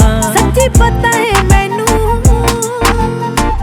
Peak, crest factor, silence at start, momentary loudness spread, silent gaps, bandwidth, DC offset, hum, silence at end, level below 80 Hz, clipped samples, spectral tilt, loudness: 0 dBFS; 10 dB; 0 s; 5 LU; none; 19.5 kHz; under 0.1%; none; 0 s; -16 dBFS; 0.2%; -4.5 dB/octave; -11 LUFS